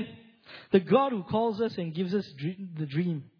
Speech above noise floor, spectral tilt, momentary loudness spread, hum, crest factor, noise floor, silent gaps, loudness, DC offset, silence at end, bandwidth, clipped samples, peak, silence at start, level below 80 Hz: 23 dB; -9 dB/octave; 13 LU; none; 22 dB; -51 dBFS; none; -29 LUFS; under 0.1%; 0.15 s; 5.4 kHz; under 0.1%; -8 dBFS; 0 s; -68 dBFS